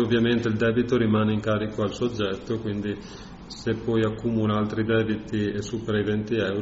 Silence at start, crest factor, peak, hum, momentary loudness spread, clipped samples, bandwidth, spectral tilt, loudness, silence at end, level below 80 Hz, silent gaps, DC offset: 0 s; 16 dB; -10 dBFS; none; 8 LU; under 0.1%; 8 kHz; -6 dB/octave; -25 LUFS; 0 s; -48 dBFS; none; under 0.1%